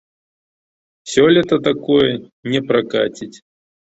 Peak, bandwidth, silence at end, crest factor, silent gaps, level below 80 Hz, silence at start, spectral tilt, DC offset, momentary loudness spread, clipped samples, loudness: -2 dBFS; 8 kHz; 0.5 s; 16 dB; 2.32-2.43 s; -54 dBFS; 1.05 s; -5 dB/octave; under 0.1%; 17 LU; under 0.1%; -16 LUFS